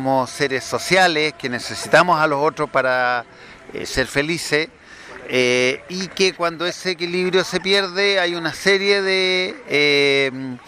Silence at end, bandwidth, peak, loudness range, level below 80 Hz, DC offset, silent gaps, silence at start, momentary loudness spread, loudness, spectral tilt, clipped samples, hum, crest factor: 0.1 s; 15 kHz; 0 dBFS; 4 LU; -50 dBFS; under 0.1%; none; 0 s; 10 LU; -18 LUFS; -3.5 dB/octave; under 0.1%; none; 18 dB